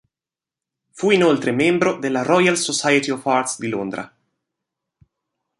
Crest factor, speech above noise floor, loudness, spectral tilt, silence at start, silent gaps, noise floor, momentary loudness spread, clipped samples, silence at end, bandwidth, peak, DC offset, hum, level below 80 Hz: 18 dB; 71 dB; -18 LUFS; -4 dB/octave; 0.95 s; none; -90 dBFS; 10 LU; under 0.1%; 1.55 s; 11.5 kHz; -2 dBFS; under 0.1%; none; -64 dBFS